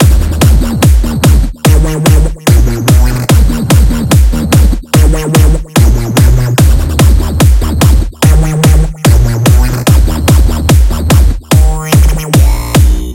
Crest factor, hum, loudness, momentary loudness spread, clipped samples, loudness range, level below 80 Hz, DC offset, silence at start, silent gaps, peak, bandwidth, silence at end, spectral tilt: 6 dB; none; -9 LUFS; 1 LU; 3%; 0 LU; -10 dBFS; under 0.1%; 0 s; none; 0 dBFS; 17 kHz; 0 s; -5.5 dB/octave